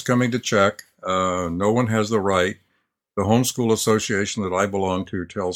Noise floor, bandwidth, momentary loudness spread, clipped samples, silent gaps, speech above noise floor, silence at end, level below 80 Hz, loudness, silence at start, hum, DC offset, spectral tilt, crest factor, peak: -71 dBFS; 17.5 kHz; 7 LU; under 0.1%; none; 50 dB; 0 s; -54 dBFS; -21 LUFS; 0 s; none; under 0.1%; -5 dB/octave; 18 dB; -2 dBFS